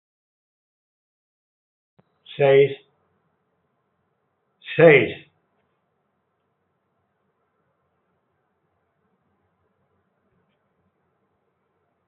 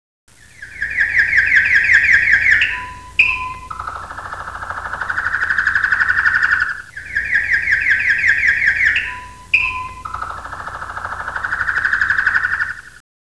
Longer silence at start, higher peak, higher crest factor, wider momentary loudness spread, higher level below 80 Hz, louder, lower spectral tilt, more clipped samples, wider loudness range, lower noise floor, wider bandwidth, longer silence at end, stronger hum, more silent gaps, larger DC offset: first, 2.4 s vs 0.6 s; about the same, -2 dBFS vs 0 dBFS; first, 24 dB vs 16 dB; first, 26 LU vs 17 LU; second, -72 dBFS vs -42 dBFS; second, -17 LUFS vs -14 LUFS; first, -4.5 dB/octave vs -2 dB/octave; neither; about the same, 5 LU vs 6 LU; first, -73 dBFS vs -37 dBFS; second, 4 kHz vs 11 kHz; first, 6.95 s vs 0.35 s; neither; neither; second, under 0.1% vs 0.4%